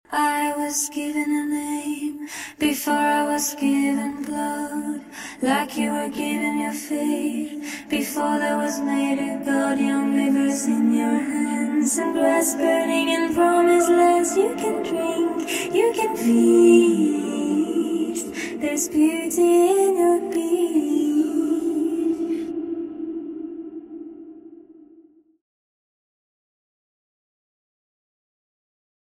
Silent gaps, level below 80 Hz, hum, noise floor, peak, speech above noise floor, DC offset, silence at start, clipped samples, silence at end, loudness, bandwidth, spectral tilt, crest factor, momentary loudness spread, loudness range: none; -62 dBFS; none; -53 dBFS; -4 dBFS; 32 dB; under 0.1%; 0.1 s; under 0.1%; 4.5 s; -21 LUFS; 16 kHz; -3.5 dB/octave; 18 dB; 12 LU; 6 LU